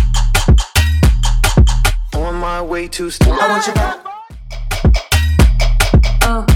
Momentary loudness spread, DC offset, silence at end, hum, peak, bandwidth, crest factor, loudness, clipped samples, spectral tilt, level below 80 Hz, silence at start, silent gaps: 10 LU; under 0.1%; 0 s; none; 0 dBFS; 17 kHz; 12 dB; -14 LUFS; under 0.1%; -5 dB/octave; -14 dBFS; 0 s; none